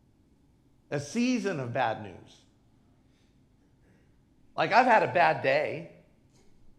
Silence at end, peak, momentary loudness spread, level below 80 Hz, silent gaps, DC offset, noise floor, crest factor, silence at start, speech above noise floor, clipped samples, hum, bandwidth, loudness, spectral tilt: 0.9 s; -6 dBFS; 19 LU; -68 dBFS; none; under 0.1%; -63 dBFS; 24 dB; 0.9 s; 37 dB; under 0.1%; none; 11.5 kHz; -27 LUFS; -5 dB/octave